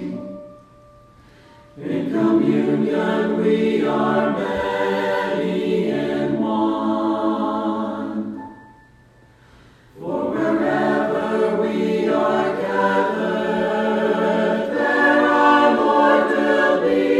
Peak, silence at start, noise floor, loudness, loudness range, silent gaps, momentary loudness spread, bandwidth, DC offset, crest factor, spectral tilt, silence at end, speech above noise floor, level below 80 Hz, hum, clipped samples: -2 dBFS; 0 s; -51 dBFS; -19 LUFS; 8 LU; none; 10 LU; 12 kHz; under 0.1%; 18 dB; -6.5 dB/octave; 0 s; 32 dB; -58 dBFS; none; under 0.1%